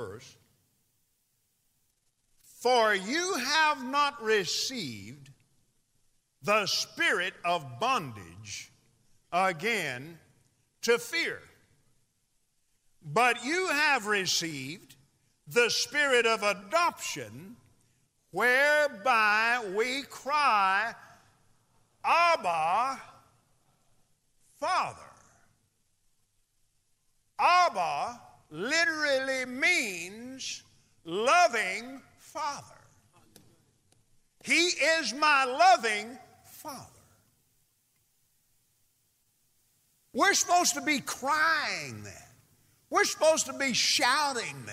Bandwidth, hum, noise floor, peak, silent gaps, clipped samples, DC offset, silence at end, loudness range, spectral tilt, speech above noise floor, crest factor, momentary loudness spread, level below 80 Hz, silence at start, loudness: 16 kHz; none; -74 dBFS; -12 dBFS; none; under 0.1%; under 0.1%; 0 s; 7 LU; -1.5 dB/octave; 47 dB; 20 dB; 18 LU; -76 dBFS; 0 s; -27 LUFS